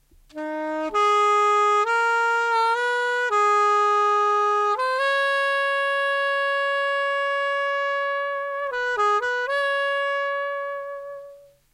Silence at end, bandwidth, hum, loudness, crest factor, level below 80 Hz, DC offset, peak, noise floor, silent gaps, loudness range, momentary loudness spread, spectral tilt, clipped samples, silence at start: 0.35 s; 13.5 kHz; none; -22 LUFS; 12 dB; -66 dBFS; under 0.1%; -10 dBFS; -47 dBFS; none; 4 LU; 10 LU; -0.5 dB/octave; under 0.1%; 0.35 s